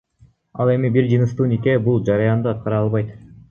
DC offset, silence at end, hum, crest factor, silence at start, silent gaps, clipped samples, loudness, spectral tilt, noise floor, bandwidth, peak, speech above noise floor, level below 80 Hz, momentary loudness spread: under 0.1%; 0.3 s; none; 16 dB; 0.55 s; none; under 0.1%; -19 LUFS; -9.5 dB/octave; -54 dBFS; 6.8 kHz; -2 dBFS; 37 dB; -50 dBFS; 6 LU